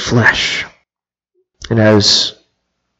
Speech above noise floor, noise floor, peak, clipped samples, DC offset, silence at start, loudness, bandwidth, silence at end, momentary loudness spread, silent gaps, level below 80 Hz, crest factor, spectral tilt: over 79 dB; under -90 dBFS; 0 dBFS; under 0.1%; under 0.1%; 0 s; -12 LUFS; 8.2 kHz; 0.7 s; 11 LU; none; -42 dBFS; 16 dB; -4 dB/octave